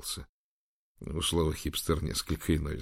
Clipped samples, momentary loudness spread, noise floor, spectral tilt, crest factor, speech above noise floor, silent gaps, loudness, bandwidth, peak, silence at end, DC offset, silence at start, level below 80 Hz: under 0.1%; 11 LU; under -90 dBFS; -4.5 dB/octave; 18 dB; over 59 dB; 0.29-0.95 s; -32 LUFS; 16 kHz; -14 dBFS; 0 s; under 0.1%; 0 s; -42 dBFS